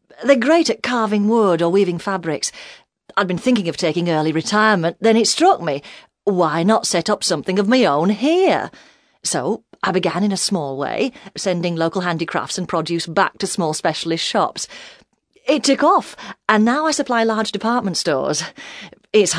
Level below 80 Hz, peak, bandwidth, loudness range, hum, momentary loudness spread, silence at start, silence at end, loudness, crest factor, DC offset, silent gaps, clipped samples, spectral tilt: -62 dBFS; 0 dBFS; 11 kHz; 4 LU; none; 10 LU; 0.2 s; 0 s; -18 LUFS; 18 dB; under 0.1%; none; under 0.1%; -4 dB/octave